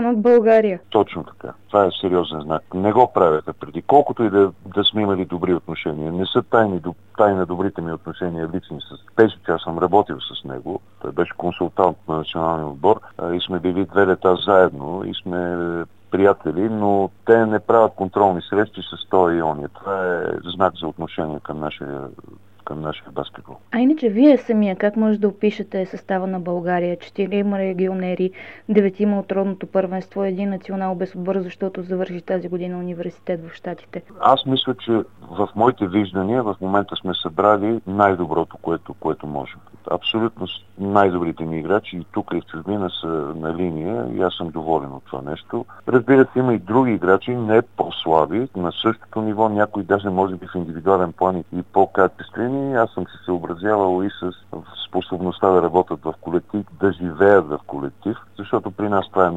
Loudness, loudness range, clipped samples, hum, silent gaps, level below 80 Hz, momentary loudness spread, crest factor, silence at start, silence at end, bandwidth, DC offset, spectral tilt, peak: -20 LUFS; 6 LU; under 0.1%; none; none; -54 dBFS; 13 LU; 20 dB; 0 s; 0 s; 7.8 kHz; 0.4%; -8 dB/octave; 0 dBFS